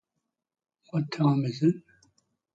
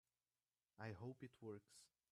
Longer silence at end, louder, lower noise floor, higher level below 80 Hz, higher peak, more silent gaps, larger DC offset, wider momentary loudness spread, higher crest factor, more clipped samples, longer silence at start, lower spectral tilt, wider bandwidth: first, 0.75 s vs 0.25 s; first, -28 LUFS vs -57 LUFS; second, -84 dBFS vs under -90 dBFS; first, -72 dBFS vs -90 dBFS; first, -12 dBFS vs -40 dBFS; neither; neither; second, 9 LU vs 13 LU; about the same, 18 dB vs 20 dB; neither; first, 0.95 s vs 0.8 s; first, -8 dB/octave vs -6.5 dB/octave; second, 7.8 kHz vs 13 kHz